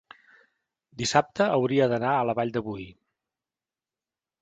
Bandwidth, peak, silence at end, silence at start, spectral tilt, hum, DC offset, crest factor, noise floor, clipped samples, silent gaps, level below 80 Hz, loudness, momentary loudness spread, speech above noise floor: 9.4 kHz; -6 dBFS; 1.5 s; 0.95 s; -5 dB/octave; none; under 0.1%; 22 dB; under -90 dBFS; under 0.1%; none; -62 dBFS; -25 LUFS; 13 LU; over 65 dB